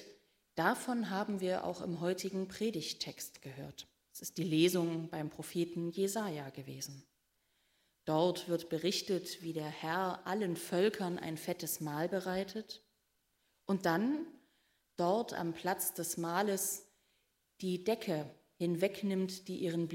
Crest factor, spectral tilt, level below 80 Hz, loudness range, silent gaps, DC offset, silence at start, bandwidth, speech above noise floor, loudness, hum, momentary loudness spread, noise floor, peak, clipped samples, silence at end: 22 dB; -4.5 dB/octave; -78 dBFS; 2 LU; none; under 0.1%; 0 s; 16 kHz; 43 dB; -37 LUFS; none; 13 LU; -79 dBFS; -16 dBFS; under 0.1%; 0 s